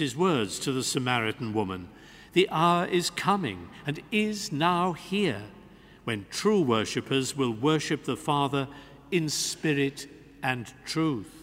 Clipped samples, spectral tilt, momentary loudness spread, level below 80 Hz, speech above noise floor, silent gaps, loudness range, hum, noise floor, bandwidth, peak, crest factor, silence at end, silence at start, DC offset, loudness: under 0.1%; -4.5 dB/octave; 11 LU; -62 dBFS; 24 dB; none; 2 LU; none; -51 dBFS; 16 kHz; -8 dBFS; 20 dB; 0 s; 0 s; under 0.1%; -28 LUFS